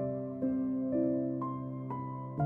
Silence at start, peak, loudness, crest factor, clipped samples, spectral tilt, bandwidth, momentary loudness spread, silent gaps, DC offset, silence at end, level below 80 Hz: 0 s; -20 dBFS; -35 LUFS; 14 dB; under 0.1%; -13 dB/octave; 2.5 kHz; 8 LU; none; under 0.1%; 0 s; -66 dBFS